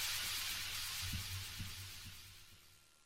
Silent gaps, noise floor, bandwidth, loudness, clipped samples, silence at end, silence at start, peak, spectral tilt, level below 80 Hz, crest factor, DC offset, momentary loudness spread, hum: none; -65 dBFS; 16 kHz; -42 LUFS; under 0.1%; 0.05 s; 0 s; -28 dBFS; -1 dB/octave; -58 dBFS; 18 dB; under 0.1%; 19 LU; none